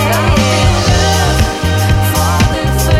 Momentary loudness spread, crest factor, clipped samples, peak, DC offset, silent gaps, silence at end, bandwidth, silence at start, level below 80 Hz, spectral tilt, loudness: 3 LU; 10 dB; under 0.1%; 0 dBFS; under 0.1%; none; 0 s; 16 kHz; 0 s; -18 dBFS; -4.5 dB/octave; -11 LUFS